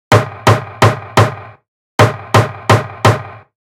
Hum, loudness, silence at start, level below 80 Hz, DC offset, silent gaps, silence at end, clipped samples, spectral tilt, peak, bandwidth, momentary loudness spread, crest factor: none; -13 LUFS; 0.1 s; -42 dBFS; under 0.1%; 1.68-1.98 s; 0.3 s; 0.5%; -5.5 dB/octave; 0 dBFS; 16 kHz; 10 LU; 14 dB